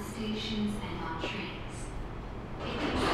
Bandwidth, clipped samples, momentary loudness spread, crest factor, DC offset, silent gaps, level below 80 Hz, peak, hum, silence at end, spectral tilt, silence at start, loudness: 13.5 kHz; under 0.1%; 9 LU; 18 dB; under 0.1%; none; -44 dBFS; -16 dBFS; none; 0 s; -5 dB/octave; 0 s; -36 LUFS